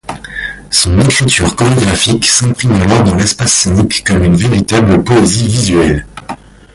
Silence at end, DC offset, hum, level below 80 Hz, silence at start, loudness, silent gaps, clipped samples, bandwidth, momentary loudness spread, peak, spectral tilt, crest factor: 0.4 s; under 0.1%; none; -26 dBFS; 0.05 s; -9 LUFS; none; under 0.1%; 11.5 kHz; 12 LU; 0 dBFS; -4 dB/octave; 10 dB